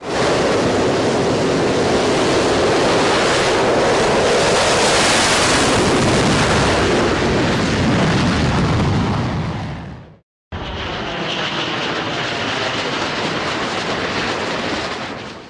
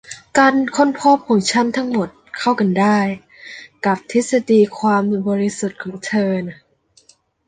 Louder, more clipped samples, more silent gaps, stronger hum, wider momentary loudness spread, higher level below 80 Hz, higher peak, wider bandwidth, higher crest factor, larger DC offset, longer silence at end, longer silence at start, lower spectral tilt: about the same, -16 LUFS vs -17 LUFS; neither; first, 10.23-10.51 s vs none; neither; about the same, 10 LU vs 12 LU; first, -36 dBFS vs -60 dBFS; second, -6 dBFS vs -2 dBFS; first, 11.5 kHz vs 9.6 kHz; second, 10 dB vs 16 dB; neither; second, 0 s vs 0.95 s; about the same, 0 s vs 0.1 s; about the same, -4 dB/octave vs -5 dB/octave